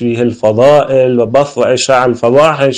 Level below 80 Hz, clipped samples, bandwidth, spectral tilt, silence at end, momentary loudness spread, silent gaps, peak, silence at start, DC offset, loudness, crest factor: -48 dBFS; 0.4%; 10 kHz; -5 dB/octave; 0 s; 4 LU; none; 0 dBFS; 0 s; under 0.1%; -9 LUFS; 10 dB